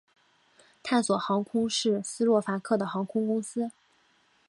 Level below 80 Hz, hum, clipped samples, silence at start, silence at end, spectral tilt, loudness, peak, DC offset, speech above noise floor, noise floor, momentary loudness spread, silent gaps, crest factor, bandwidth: -74 dBFS; none; under 0.1%; 0.85 s; 0.8 s; -4.5 dB/octave; -28 LUFS; -12 dBFS; under 0.1%; 39 dB; -66 dBFS; 8 LU; none; 18 dB; 11.5 kHz